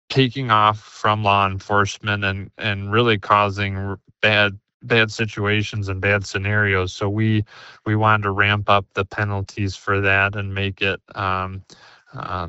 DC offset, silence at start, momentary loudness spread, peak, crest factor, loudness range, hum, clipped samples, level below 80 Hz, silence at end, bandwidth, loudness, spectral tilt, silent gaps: under 0.1%; 0.1 s; 9 LU; 0 dBFS; 20 dB; 2 LU; none; under 0.1%; -54 dBFS; 0 s; 8 kHz; -20 LUFS; -5.5 dB/octave; 4.74-4.80 s